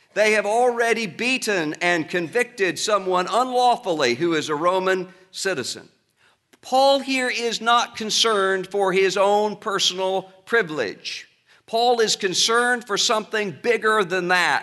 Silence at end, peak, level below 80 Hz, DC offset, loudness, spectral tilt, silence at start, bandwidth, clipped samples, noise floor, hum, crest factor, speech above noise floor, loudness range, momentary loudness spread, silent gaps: 0 s; -4 dBFS; -74 dBFS; under 0.1%; -21 LUFS; -2.5 dB/octave; 0.15 s; 12 kHz; under 0.1%; -62 dBFS; none; 18 dB; 41 dB; 3 LU; 8 LU; none